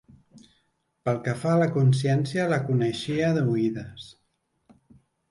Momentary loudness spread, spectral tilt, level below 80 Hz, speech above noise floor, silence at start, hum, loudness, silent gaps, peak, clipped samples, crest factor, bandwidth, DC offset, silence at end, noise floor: 14 LU; -7 dB/octave; -62 dBFS; 47 dB; 1.05 s; none; -25 LUFS; none; -10 dBFS; under 0.1%; 16 dB; 11.5 kHz; under 0.1%; 1.2 s; -71 dBFS